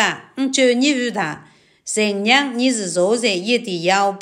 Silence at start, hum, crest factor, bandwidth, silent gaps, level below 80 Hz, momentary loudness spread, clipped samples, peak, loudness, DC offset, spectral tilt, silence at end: 0 s; none; 18 dB; 14 kHz; none; -72 dBFS; 9 LU; under 0.1%; 0 dBFS; -18 LUFS; under 0.1%; -3 dB/octave; 0 s